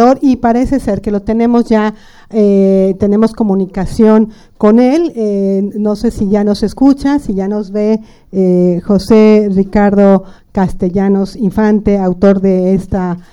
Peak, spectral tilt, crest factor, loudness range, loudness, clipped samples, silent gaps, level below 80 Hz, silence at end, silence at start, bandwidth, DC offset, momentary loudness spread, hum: 0 dBFS; -8.5 dB/octave; 10 dB; 2 LU; -11 LUFS; 0.2%; none; -32 dBFS; 0.1 s; 0 s; 11.5 kHz; under 0.1%; 8 LU; none